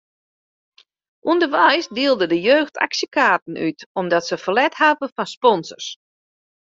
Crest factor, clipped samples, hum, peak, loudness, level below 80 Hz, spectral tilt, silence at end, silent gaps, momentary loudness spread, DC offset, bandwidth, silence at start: 18 dB; under 0.1%; none; -2 dBFS; -18 LUFS; -66 dBFS; -3.5 dB/octave; 0.8 s; 3.42-3.46 s, 3.86-3.95 s, 5.12-5.16 s, 5.37-5.41 s; 11 LU; under 0.1%; 7.8 kHz; 1.25 s